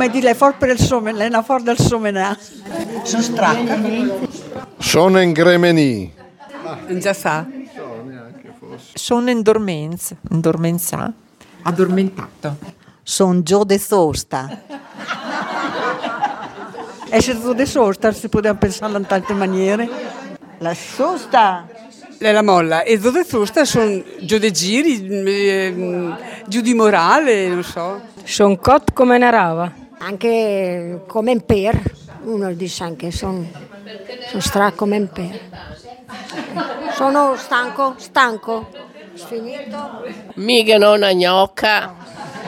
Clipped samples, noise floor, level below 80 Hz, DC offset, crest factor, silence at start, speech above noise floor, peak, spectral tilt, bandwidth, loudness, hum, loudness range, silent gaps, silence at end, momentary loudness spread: under 0.1%; -38 dBFS; -44 dBFS; under 0.1%; 18 dB; 0 s; 22 dB; 0 dBFS; -4.5 dB/octave; 17.5 kHz; -16 LUFS; none; 6 LU; none; 0 s; 19 LU